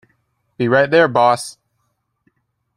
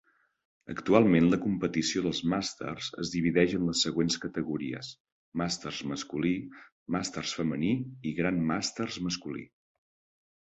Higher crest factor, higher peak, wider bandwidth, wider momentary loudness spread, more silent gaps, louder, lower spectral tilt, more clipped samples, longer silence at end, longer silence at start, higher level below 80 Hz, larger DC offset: second, 18 dB vs 24 dB; first, -2 dBFS vs -6 dBFS; first, 13.5 kHz vs 8.2 kHz; about the same, 10 LU vs 12 LU; second, none vs 5.00-5.05 s, 5.12-5.32 s, 6.72-6.86 s; first, -15 LUFS vs -30 LUFS; about the same, -5 dB/octave vs -5 dB/octave; neither; first, 1.25 s vs 1 s; about the same, 0.6 s vs 0.65 s; about the same, -62 dBFS vs -58 dBFS; neither